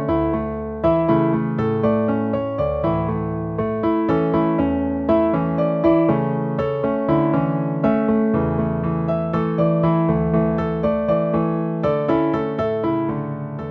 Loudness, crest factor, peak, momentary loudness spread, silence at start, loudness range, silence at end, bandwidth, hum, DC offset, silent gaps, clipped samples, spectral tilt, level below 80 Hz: -20 LUFS; 16 dB; -4 dBFS; 5 LU; 0 s; 1 LU; 0 s; 5 kHz; none; under 0.1%; none; under 0.1%; -11 dB/octave; -40 dBFS